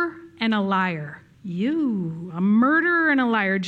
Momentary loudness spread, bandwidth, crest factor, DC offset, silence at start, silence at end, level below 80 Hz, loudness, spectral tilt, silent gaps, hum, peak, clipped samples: 14 LU; 7.4 kHz; 14 dB; under 0.1%; 0 s; 0 s; -70 dBFS; -21 LUFS; -7 dB/octave; none; none; -8 dBFS; under 0.1%